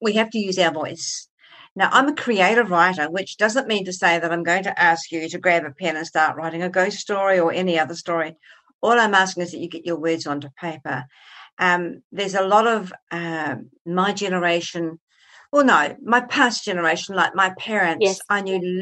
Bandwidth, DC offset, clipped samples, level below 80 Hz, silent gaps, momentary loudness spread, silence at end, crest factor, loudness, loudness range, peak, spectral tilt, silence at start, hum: 12.5 kHz; under 0.1%; under 0.1%; -72 dBFS; 1.30-1.38 s, 1.71-1.76 s, 8.74-8.79 s, 11.52-11.57 s, 12.04-12.10 s, 13.02-13.07 s, 13.80-13.85 s, 15.01-15.07 s; 12 LU; 0 s; 18 dB; -20 LUFS; 4 LU; -2 dBFS; -4 dB/octave; 0 s; none